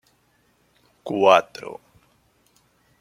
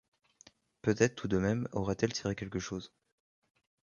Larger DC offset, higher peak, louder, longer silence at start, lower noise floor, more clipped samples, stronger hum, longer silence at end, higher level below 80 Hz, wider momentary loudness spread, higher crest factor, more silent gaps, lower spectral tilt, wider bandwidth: neither; first, -2 dBFS vs -10 dBFS; first, -18 LUFS vs -33 LUFS; first, 1.05 s vs 0.85 s; about the same, -64 dBFS vs -64 dBFS; neither; first, 60 Hz at -65 dBFS vs none; first, 1.25 s vs 0.95 s; second, -70 dBFS vs -58 dBFS; first, 24 LU vs 11 LU; about the same, 24 dB vs 24 dB; neither; about the same, -4.5 dB/octave vs -5.5 dB/octave; first, 15 kHz vs 7.4 kHz